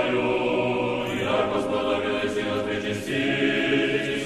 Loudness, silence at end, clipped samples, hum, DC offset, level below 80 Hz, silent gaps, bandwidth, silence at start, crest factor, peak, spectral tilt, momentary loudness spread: -24 LUFS; 0 s; under 0.1%; none; under 0.1%; -52 dBFS; none; 13.5 kHz; 0 s; 14 dB; -10 dBFS; -5 dB/octave; 4 LU